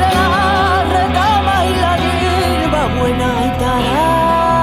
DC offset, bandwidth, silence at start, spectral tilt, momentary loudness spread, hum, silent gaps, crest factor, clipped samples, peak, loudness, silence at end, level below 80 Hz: under 0.1%; 15.5 kHz; 0 s; -5.5 dB/octave; 3 LU; none; none; 12 dB; under 0.1%; 0 dBFS; -14 LUFS; 0 s; -26 dBFS